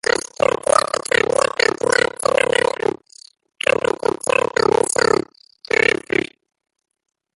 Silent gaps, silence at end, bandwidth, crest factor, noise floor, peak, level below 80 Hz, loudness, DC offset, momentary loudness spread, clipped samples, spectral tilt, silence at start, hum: none; 1.5 s; 12 kHz; 20 dB; -47 dBFS; 0 dBFS; -54 dBFS; -18 LUFS; under 0.1%; 6 LU; under 0.1%; -2.5 dB/octave; 0.4 s; none